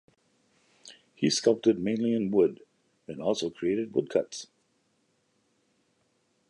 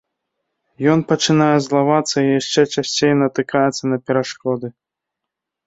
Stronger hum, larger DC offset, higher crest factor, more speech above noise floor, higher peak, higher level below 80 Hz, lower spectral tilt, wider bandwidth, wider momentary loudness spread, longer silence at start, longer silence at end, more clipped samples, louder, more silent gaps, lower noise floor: neither; neither; first, 22 dB vs 16 dB; second, 45 dB vs 65 dB; second, -10 dBFS vs -2 dBFS; second, -70 dBFS vs -60 dBFS; about the same, -5 dB/octave vs -5 dB/octave; first, 11 kHz vs 8 kHz; first, 14 LU vs 8 LU; about the same, 0.85 s vs 0.8 s; first, 2.05 s vs 0.95 s; neither; second, -28 LUFS vs -17 LUFS; neither; second, -72 dBFS vs -82 dBFS